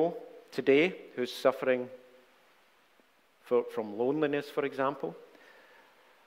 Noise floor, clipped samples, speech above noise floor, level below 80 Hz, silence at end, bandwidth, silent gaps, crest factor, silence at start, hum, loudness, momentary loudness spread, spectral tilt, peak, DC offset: -66 dBFS; under 0.1%; 36 dB; -80 dBFS; 1 s; 16 kHz; none; 20 dB; 0 s; none; -31 LUFS; 14 LU; -6 dB/octave; -12 dBFS; under 0.1%